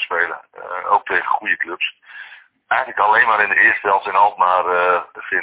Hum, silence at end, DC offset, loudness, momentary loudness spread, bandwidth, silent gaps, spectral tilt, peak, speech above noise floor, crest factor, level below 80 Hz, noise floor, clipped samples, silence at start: none; 0 s; under 0.1%; -16 LUFS; 15 LU; 4 kHz; none; -5.5 dB/octave; 0 dBFS; 25 dB; 16 dB; -64 dBFS; -42 dBFS; under 0.1%; 0 s